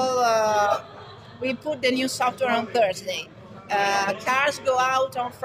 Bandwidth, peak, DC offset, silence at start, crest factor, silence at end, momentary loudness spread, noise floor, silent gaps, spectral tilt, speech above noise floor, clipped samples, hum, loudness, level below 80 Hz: 16 kHz; -8 dBFS; under 0.1%; 0 s; 16 dB; 0 s; 10 LU; -43 dBFS; none; -3 dB/octave; 19 dB; under 0.1%; none; -23 LUFS; -64 dBFS